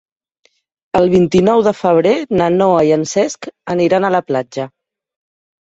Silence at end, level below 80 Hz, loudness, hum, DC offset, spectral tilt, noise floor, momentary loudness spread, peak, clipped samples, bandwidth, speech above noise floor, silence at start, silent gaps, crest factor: 0.95 s; -48 dBFS; -14 LUFS; none; under 0.1%; -6 dB/octave; -60 dBFS; 10 LU; -2 dBFS; under 0.1%; 8 kHz; 47 dB; 0.95 s; none; 14 dB